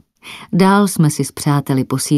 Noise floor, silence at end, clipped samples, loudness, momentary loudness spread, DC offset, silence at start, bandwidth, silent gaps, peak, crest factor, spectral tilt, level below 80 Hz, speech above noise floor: -37 dBFS; 0 s; under 0.1%; -15 LUFS; 13 LU; under 0.1%; 0.25 s; 15.5 kHz; none; 0 dBFS; 16 dB; -5.5 dB/octave; -54 dBFS; 23 dB